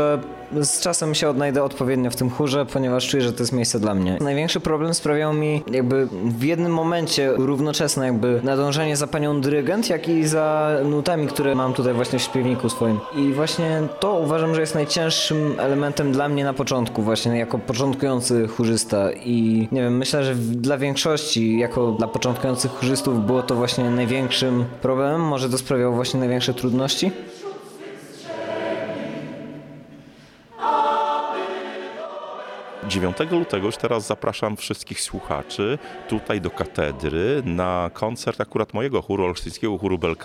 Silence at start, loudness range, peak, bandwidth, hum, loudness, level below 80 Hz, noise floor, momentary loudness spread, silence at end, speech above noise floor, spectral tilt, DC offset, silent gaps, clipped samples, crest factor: 0 s; 5 LU; -6 dBFS; 16.5 kHz; none; -22 LUFS; -50 dBFS; -47 dBFS; 8 LU; 0 s; 26 dB; -5 dB/octave; under 0.1%; none; under 0.1%; 16 dB